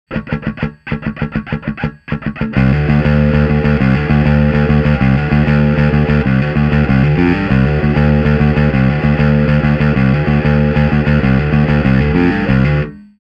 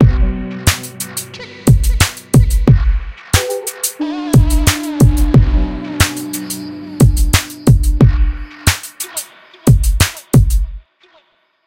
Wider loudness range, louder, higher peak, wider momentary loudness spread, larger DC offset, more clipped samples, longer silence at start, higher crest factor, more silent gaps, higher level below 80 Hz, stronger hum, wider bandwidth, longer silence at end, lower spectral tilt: about the same, 3 LU vs 1 LU; about the same, -13 LUFS vs -14 LUFS; about the same, 0 dBFS vs 0 dBFS; about the same, 9 LU vs 11 LU; neither; neither; about the same, 0.1 s vs 0 s; about the same, 12 dB vs 14 dB; neither; about the same, -22 dBFS vs -18 dBFS; neither; second, 5.6 kHz vs 17 kHz; second, 0.3 s vs 0.9 s; first, -9.5 dB/octave vs -5 dB/octave